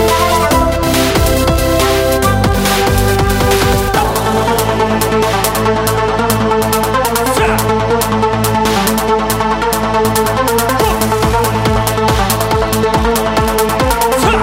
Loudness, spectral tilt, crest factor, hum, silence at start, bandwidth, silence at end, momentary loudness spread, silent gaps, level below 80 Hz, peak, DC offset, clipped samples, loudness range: -12 LUFS; -4.5 dB/octave; 12 dB; none; 0 s; 16.5 kHz; 0 s; 2 LU; none; -22 dBFS; 0 dBFS; under 0.1%; under 0.1%; 1 LU